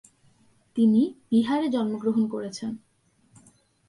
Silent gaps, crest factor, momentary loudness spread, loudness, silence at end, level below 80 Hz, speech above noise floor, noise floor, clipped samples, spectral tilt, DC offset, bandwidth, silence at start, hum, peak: none; 16 dB; 14 LU; -25 LUFS; 1.1 s; -72 dBFS; 40 dB; -64 dBFS; under 0.1%; -6.5 dB/octave; under 0.1%; 11 kHz; 0.75 s; none; -10 dBFS